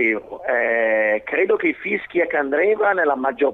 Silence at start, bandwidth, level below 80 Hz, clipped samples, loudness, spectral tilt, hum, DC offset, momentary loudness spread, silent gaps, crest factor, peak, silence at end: 0 s; 4 kHz; -60 dBFS; under 0.1%; -19 LUFS; -7 dB/octave; none; under 0.1%; 5 LU; none; 12 dB; -6 dBFS; 0 s